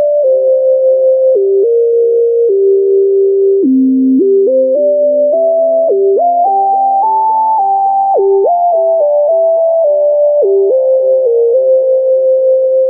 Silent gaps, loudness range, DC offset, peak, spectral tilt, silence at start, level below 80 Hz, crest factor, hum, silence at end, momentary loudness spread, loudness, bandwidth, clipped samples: none; 1 LU; under 0.1%; -2 dBFS; -13.5 dB/octave; 0 s; -78 dBFS; 6 dB; none; 0 s; 1 LU; -10 LUFS; 1.1 kHz; under 0.1%